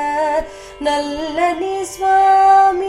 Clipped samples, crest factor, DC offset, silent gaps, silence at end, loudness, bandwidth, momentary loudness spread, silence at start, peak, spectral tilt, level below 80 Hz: under 0.1%; 12 dB; under 0.1%; none; 0 s; -15 LUFS; 13.5 kHz; 12 LU; 0 s; -2 dBFS; -3 dB/octave; -44 dBFS